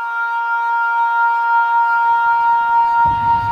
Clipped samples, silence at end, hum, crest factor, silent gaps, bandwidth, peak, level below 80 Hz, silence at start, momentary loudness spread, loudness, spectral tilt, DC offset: under 0.1%; 0 s; none; 10 dB; none; 6 kHz; -6 dBFS; -46 dBFS; 0 s; 4 LU; -15 LUFS; -5 dB/octave; under 0.1%